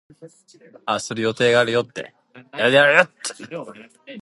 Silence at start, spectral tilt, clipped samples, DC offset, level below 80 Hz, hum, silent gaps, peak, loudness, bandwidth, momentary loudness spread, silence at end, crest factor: 0.2 s; -3.5 dB/octave; under 0.1%; under 0.1%; -66 dBFS; none; none; 0 dBFS; -18 LUFS; 11.5 kHz; 22 LU; 0.05 s; 22 dB